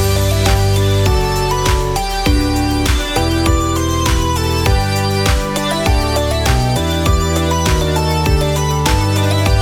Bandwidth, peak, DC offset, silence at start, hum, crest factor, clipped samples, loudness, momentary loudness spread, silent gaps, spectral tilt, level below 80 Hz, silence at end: 19 kHz; 0 dBFS; under 0.1%; 0 s; none; 14 dB; under 0.1%; -15 LUFS; 2 LU; none; -5 dB/octave; -20 dBFS; 0 s